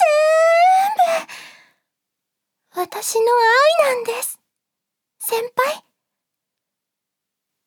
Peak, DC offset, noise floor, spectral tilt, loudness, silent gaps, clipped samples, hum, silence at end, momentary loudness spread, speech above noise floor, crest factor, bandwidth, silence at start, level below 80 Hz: -4 dBFS; under 0.1%; -82 dBFS; 0 dB/octave; -17 LUFS; none; under 0.1%; none; 1.9 s; 15 LU; 65 dB; 16 dB; 20 kHz; 0 s; -82 dBFS